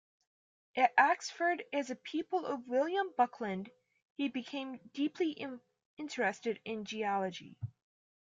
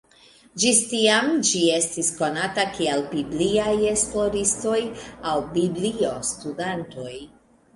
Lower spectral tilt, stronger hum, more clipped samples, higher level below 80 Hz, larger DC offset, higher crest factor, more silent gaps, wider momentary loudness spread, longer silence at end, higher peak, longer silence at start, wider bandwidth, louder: first, -4.5 dB/octave vs -2.5 dB/octave; neither; neither; second, -82 dBFS vs -52 dBFS; neither; about the same, 24 dB vs 20 dB; first, 4.02-4.16 s, 5.85-5.97 s vs none; first, 16 LU vs 13 LU; about the same, 0.6 s vs 0.5 s; second, -12 dBFS vs -4 dBFS; first, 0.75 s vs 0.55 s; second, 9.2 kHz vs 11.5 kHz; second, -35 LUFS vs -22 LUFS